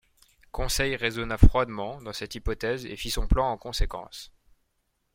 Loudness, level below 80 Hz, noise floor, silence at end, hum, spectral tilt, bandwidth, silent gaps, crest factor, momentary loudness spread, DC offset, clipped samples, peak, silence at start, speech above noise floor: -28 LUFS; -30 dBFS; -75 dBFS; 0.9 s; none; -5 dB/octave; 16.5 kHz; none; 24 dB; 16 LU; under 0.1%; under 0.1%; -2 dBFS; 0.55 s; 50 dB